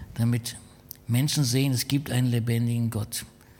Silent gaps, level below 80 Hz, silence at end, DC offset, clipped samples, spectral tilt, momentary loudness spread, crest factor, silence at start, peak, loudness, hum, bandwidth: none; -54 dBFS; 0.3 s; under 0.1%; under 0.1%; -5 dB/octave; 13 LU; 14 dB; 0 s; -12 dBFS; -26 LUFS; none; 17.5 kHz